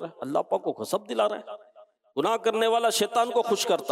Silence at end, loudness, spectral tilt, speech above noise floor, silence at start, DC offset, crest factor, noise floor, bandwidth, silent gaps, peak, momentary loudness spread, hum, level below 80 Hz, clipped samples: 0 s; -26 LUFS; -3 dB/octave; 29 dB; 0 s; under 0.1%; 14 dB; -55 dBFS; 16 kHz; none; -12 dBFS; 11 LU; none; -84 dBFS; under 0.1%